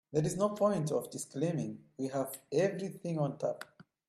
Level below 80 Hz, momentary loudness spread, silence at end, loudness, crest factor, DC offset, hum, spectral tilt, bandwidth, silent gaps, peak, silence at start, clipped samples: -72 dBFS; 10 LU; 0.25 s; -35 LUFS; 18 dB; under 0.1%; none; -6.5 dB/octave; 14 kHz; none; -18 dBFS; 0.1 s; under 0.1%